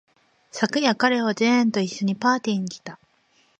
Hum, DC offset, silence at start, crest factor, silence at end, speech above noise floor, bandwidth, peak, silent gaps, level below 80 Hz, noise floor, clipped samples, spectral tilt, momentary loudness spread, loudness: none; under 0.1%; 0.55 s; 20 dB; 0.65 s; 41 dB; 8.8 kHz; -4 dBFS; none; -72 dBFS; -63 dBFS; under 0.1%; -4.5 dB/octave; 16 LU; -22 LUFS